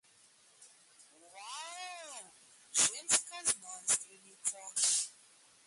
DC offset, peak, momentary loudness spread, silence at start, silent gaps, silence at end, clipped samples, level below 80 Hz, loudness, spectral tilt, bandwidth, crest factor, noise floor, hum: under 0.1%; -12 dBFS; 17 LU; 0.6 s; none; 0.55 s; under 0.1%; -80 dBFS; -33 LUFS; 1.5 dB/octave; 12 kHz; 26 dB; -65 dBFS; none